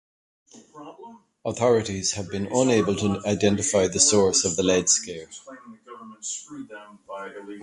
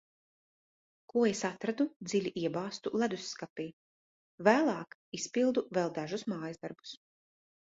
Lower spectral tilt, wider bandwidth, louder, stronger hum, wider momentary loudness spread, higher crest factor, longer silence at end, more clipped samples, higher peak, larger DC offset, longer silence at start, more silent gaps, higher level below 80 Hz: about the same, -3.5 dB/octave vs -4.5 dB/octave; first, 11.5 kHz vs 8 kHz; first, -22 LUFS vs -33 LUFS; neither; first, 23 LU vs 15 LU; about the same, 22 dB vs 24 dB; second, 0 s vs 0.8 s; neither; first, -4 dBFS vs -10 dBFS; neither; second, 0.55 s vs 1.15 s; second, none vs 1.96-2.00 s, 3.50-3.56 s, 3.73-4.38 s, 4.94-5.12 s; first, -52 dBFS vs -76 dBFS